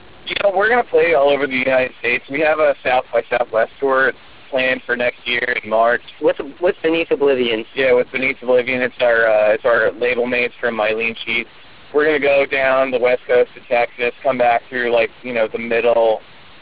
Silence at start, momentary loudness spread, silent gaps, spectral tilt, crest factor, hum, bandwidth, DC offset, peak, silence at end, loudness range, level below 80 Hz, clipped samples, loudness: 0.25 s; 5 LU; none; -7.5 dB/octave; 14 dB; none; 4 kHz; 0.8%; -4 dBFS; 0.4 s; 2 LU; -54 dBFS; under 0.1%; -17 LUFS